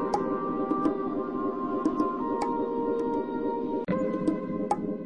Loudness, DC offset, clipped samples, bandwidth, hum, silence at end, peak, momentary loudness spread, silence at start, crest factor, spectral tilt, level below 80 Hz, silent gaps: -29 LUFS; 0.3%; under 0.1%; 11 kHz; none; 0 s; -14 dBFS; 3 LU; 0 s; 14 dB; -8 dB/octave; -58 dBFS; none